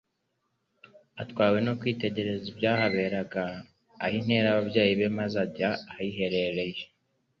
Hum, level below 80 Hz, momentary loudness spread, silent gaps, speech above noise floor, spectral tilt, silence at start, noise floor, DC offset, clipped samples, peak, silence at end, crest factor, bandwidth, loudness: none; -62 dBFS; 11 LU; none; 50 dB; -7.5 dB/octave; 1.15 s; -78 dBFS; under 0.1%; under 0.1%; -10 dBFS; 0.55 s; 20 dB; 7 kHz; -28 LUFS